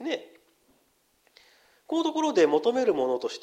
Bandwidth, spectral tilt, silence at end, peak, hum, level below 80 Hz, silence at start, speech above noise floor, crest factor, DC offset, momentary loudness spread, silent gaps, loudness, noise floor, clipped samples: 10 kHz; -4 dB/octave; 0.05 s; -10 dBFS; none; -76 dBFS; 0 s; 44 dB; 18 dB; under 0.1%; 10 LU; none; -26 LUFS; -68 dBFS; under 0.1%